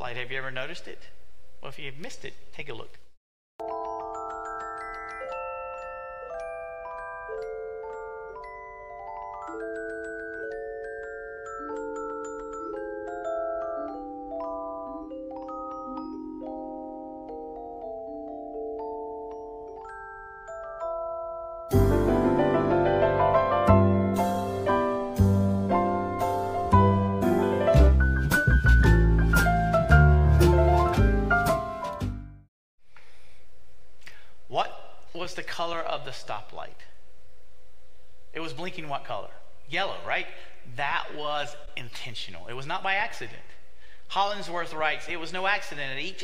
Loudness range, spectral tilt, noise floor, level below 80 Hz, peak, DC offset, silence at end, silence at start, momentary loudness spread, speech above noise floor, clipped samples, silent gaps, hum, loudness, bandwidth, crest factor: 16 LU; -6.5 dB/octave; -59 dBFS; -34 dBFS; -6 dBFS; under 0.1%; 0 s; 0 s; 19 LU; 29 dB; under 0.1%; 3.17-3.59 s, 32.48-32.78 s; none; -27 LUFS; 16 kHz; 22 dB